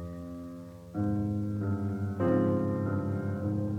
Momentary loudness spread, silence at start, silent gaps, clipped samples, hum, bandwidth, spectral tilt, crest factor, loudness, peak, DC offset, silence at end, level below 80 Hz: 14 LU; 0 s; none; under 0.1%; none; 7.2 kHz; -10 dB/octave; 14 dB; -31 LUFS; -16 dBFS; under 0.1%; 0 s; -56 dBFS